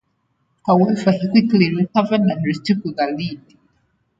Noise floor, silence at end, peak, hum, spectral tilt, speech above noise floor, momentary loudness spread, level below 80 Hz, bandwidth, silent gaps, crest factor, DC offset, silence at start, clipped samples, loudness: -67 dBFS; 0.8 s; -2 dBFS; none; -7.5 dB/octave; 50 dB; 11 LU; -58 dBFS; 7.8 kHz; none; 18 dB; under 0.1%; 0.65 s; under 0.1%; -18 LUFS